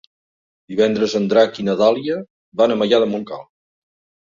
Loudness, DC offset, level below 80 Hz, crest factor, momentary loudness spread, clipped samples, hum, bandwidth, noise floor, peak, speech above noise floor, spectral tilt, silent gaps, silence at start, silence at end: -18 LUFS; under 0.1%; -62 dBFS; 18 dB; 12 LU; under 0.1%; none; 7.4 kHz; under -90 dBFS; -2 dBFS; over 73 dB; -5.5 dB/octave; 2.30-2.52 s; 0.7 s; 0.8 s